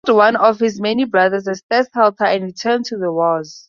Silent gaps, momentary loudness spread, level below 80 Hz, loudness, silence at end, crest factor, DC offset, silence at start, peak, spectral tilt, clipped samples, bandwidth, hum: 1.63-1.69 s; 6 LU; -64 dBFS; -16 LUFS; 0.1 s; 14 dB; under 0.1%; 0.05 s; -2 dBFS; -5 dB/octave; under 0.1%; 7.4 kHz; none